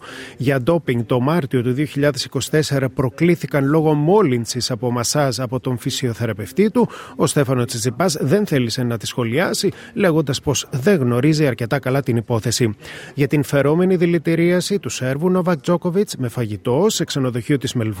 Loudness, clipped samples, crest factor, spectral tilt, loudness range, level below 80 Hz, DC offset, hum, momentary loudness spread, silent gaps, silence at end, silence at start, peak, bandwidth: -19 LUFS; under 0.1%; 14 dB; -5.5 dB/octave; 2 LU; -52 dBFS; under 0.1%; none; 7 LU; none; 0 s; 0 s; -4 dBFS; 17 kHz